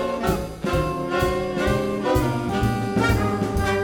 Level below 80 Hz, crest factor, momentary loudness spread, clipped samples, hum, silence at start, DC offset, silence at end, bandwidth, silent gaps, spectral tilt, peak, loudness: -32 dBFS; 14 dB; 3 LU; under 0.1%; none; 0 s; under 0.1%; 0 s; 20 kHz; none; -6 dB/octave; -8 dBFS; -23 LUFS